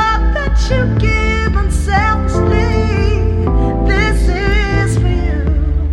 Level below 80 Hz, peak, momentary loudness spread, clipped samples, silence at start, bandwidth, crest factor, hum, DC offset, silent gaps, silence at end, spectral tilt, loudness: -16 dBFS; 0 dBFS; 3 LU; under 0.1%; 0 s; 11 kHz; 12 dB; none; under 0.1%; none; 0 s; -6.5 dB/octave; -14 LUFS